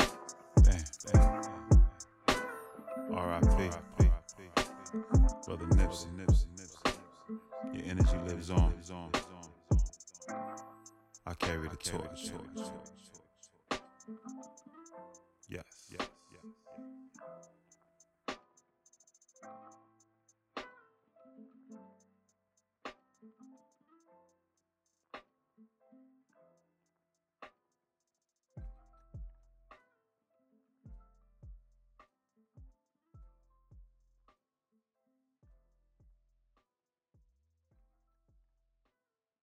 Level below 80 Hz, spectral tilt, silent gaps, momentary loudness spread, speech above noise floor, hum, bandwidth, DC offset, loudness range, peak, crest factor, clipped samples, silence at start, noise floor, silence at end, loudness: -38 dBFS; -6 dB/octave; none; 25 LU; over 58 dB; none; 12.5 kHz; under 0.1%; 26 LU; -12 dBFS; 22 dB; under 0.1%; 0 s; under -90 dBFS; 6.8 s; -33 LUFS